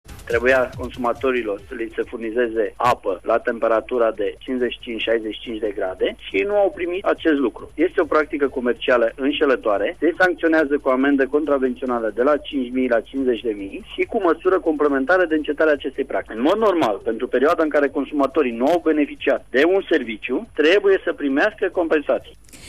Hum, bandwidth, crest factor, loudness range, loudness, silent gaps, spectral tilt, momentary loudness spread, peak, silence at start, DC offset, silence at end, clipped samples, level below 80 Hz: none; 13.5 kHz; 14 dB; 3 LU; -20 LUFS; none; -5.5 dB/octave; 8 LU; -6 dBFS; 0.1 s; 0.4%; 0 s; under 0.1%; -48 dBFS